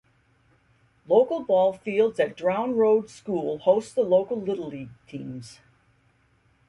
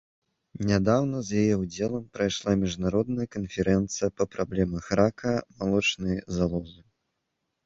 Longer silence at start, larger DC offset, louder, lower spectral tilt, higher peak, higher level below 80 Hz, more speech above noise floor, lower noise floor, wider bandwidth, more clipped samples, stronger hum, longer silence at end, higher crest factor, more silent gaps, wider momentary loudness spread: first, 1.1 s vs 0.6 s; neither; first, -24 LUFS vs -27 LUFS; about the same, -6.5 dB/octave vs -5.5 dB/octave; about the same, -8 dBFS vs -8 dBFS; second, -66 dBFS vs -48 dBFS; second, 40 dB vs 54 dB; second, -64 dBFS vs -80 dBFS; first, 11.5 kHz vs 7.8 kHz; neither; neither; first, 1.15 s vs 0.9 s; about the same, 18 dB vs 20 dB; neither; first, 16 LU vs 6 LU